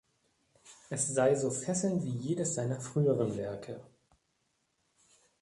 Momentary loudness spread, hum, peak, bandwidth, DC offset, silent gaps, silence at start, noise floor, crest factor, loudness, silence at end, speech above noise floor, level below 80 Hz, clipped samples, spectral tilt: 12 LU; none; -16 dBFS; 11.5 kHz; under 0.1%; none; 0.65 s; -78 dBFS; 18 dB; -32 LUFS; 1.55 s; 46 dB; -70 dBFS; under 0.1%; -5.5 dB/octave